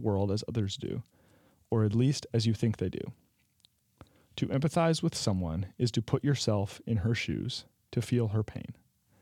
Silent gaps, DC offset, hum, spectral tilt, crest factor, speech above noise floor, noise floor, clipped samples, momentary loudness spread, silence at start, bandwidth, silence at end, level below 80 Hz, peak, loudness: none; under 0.1%; none; -6 dB/octave; 20 dB; 38 dB; -68 dBFS; under 0.1%; 11 LU; 0 s; 13 kHz; 0.5 s; -60 dBFS; -12 dBFS; -31 LUFS